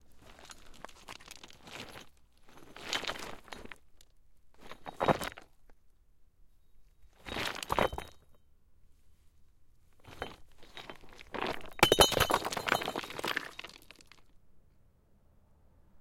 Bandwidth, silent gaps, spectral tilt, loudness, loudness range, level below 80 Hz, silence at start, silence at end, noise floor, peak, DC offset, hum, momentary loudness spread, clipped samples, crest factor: 16.5 kHz; none; -2.5 dB/octave; -32 LUFS; 13 LU; -54 dBFS; 0.05 s; 0 s; -64 dBFS; -10 dBFS; under 0.1%; none; 25 LU; under 0.1%; 28 dB